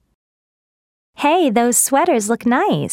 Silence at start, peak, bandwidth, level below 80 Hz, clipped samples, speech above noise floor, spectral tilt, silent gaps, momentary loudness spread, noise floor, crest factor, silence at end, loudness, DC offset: 1.2 s; -2 dBFS; 19 kHz; -62 dBFS; under 0.1%; over 75 dB; -3.5 dB/octave; none; 4 LU; under -90 dBFS; 16 dB; 0 s; -15 LUFS; under 0.1%